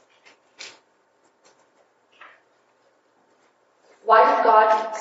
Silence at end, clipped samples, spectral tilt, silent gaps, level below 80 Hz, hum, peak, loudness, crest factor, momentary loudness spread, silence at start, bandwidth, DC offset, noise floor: 0 s; under 0.1%; -2.5 dB/octave; none; under -90 dBFS; none; -2 dBFS; -17 LUFS; 22 dB; 26 LU; 0.6 s; 8 kHz; under 0.1%; -63 dBFS